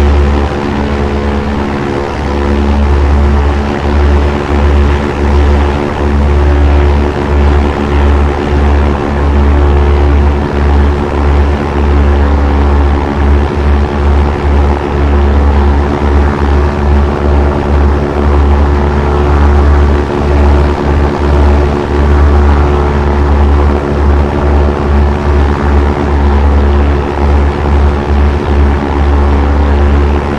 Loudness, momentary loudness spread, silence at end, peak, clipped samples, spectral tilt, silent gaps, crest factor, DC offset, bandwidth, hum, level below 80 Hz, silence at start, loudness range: -10 LUFS; 3 LU; 0 s; 0 dBFS; 0.5%; -8 dB/octave; none; 8 dB; 2%; 6.8 kHz; none; -10 dBFS; 0 s; 1 LU